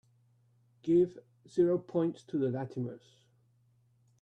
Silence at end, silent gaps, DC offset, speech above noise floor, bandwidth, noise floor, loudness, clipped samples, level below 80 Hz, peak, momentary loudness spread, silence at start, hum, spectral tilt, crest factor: 1.25 s; none; under 0.1%; 37 dB; 8.2 kHz; -69 dBFS; -32 LUFS; under 0.1%; -74 dBFS; -18 dBFS; 13 LU; 0.85 s; none; -9 dB/octave; 16 dB